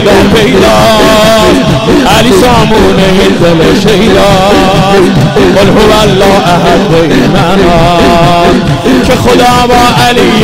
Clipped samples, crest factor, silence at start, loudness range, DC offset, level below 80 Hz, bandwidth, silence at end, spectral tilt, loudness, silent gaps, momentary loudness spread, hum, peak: 0.3%; 4 dB; 0 s; 1 LU; 2%; -20 dBFS; 16.5 kHz; 0 s; -5 dB/octave; -4 LUFS; none; 2 LU; none; 0 dBFS